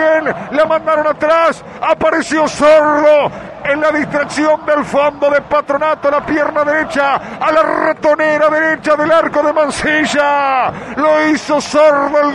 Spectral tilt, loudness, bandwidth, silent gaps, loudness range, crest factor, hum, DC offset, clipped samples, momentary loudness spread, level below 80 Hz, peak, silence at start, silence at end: -4 dB/octave; -12 LUFS; 11 kHz; none; 2 LU; 12 dB; none; under 0.1%; under 0.1%; 5 LU; -46 dBFS; -2 dBFS; 0 s; 0 s